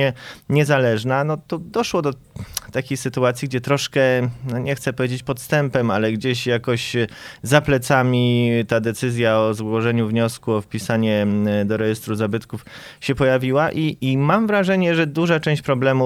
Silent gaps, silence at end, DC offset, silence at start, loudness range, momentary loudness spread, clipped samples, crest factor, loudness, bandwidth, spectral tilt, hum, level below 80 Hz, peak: none; 0 s; under 0.1%; 0 s; 3 LU; 9 LU; under 0.1%; 18 dB; -20 LUFS; 15.5 kHz; -6 dB/octave; none; -50 dBFS; 0 dBFS